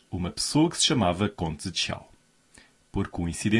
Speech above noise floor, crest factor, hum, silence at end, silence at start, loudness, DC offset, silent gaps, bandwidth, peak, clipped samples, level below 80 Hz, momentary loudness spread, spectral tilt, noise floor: 32 dB; 18 dB; none; 0 s; 0.1 s; -26 LUFS; under 0.1%; none; 12 kHz; -8 dBFS; under 0.1%; -50 dBFS; 11 LU; -4 dB/octave; -58 dBFS